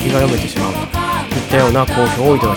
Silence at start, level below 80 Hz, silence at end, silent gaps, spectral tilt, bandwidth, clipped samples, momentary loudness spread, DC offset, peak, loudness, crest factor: 0 s; -30 dBFS; 0 s; none; -5.5 dB/octave; 19.5 kHz; under 0.1%; 6 LU; under 0.1%; 0 dBFS; -15 LUFS; 14 dB